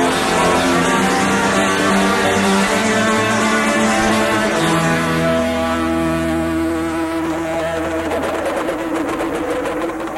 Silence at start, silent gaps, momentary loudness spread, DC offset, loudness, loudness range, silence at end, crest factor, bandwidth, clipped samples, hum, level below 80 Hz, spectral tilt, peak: 0 s; none; 6 LU; under 0.1%; -16 LUFS; 5 LU; 0 s; 12 dB; 16.5 kHz; under 0.1%; none; -40 dBFS; -4 dB/octave; -4 dBFS